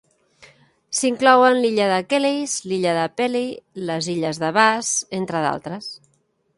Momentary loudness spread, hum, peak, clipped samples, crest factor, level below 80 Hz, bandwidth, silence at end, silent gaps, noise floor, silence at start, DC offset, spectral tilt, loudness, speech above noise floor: 14 LU; none; 0 dBFS; under 0.1%; 20 dB; -66 dBFS; 11.5 kHz; 0.6 s; none; -52 dBFS; 0.9 s; under 0.1%; -3.5 dB/octave; -20 LUFS; 32 dB